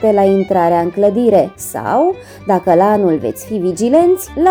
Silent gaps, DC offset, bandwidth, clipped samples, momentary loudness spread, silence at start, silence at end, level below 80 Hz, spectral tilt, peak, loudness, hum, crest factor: none; under 0.1%; over 20 kHz; under 0.1%; 8 LU; 0 s; 0 s; -46 dBFS; -6.5 dB/octave; 0 dBFS; -13 LUFS; none; 12 dB